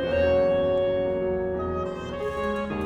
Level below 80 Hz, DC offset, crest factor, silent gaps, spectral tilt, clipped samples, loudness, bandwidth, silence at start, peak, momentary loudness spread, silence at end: -42 dBFS; under 0.1%; 14 dB; none; -7.5 dB/octave; under 0.1%; -25 LUFS; 7.8 kHz; 0 s; -12 dBFS; 9 LU; 0 s